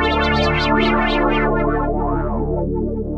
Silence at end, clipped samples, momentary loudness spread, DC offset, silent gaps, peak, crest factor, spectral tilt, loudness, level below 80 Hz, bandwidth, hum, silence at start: 0 s; under 0.1%; 6 LU; under 0.1%; none; -4 dBFS; 14 dB; -7 dB/octave; -18 LUFS; -26 dBFS; 7.8 kHz; none; 0 s